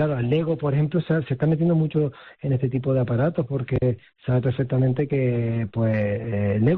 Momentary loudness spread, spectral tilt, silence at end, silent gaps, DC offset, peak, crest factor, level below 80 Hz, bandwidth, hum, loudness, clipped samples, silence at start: 4 LU; -8.5 dB/octave; 0 s; none; under 0.1%; -10 dBFS; 12 dB; -50 dBFS; 4.2 kHz; none; -23 LUFS; under 0.1%; 0 s